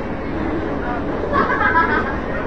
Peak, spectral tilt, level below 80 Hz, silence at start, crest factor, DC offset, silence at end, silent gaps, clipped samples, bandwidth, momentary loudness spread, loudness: -4 dBFS; -7.5 dB/octave; -32 dBFS; 0 s; 16 dB; 2%; 0 s; none; under 0.1%; 8 kHz; 8 LU; -19 LUFS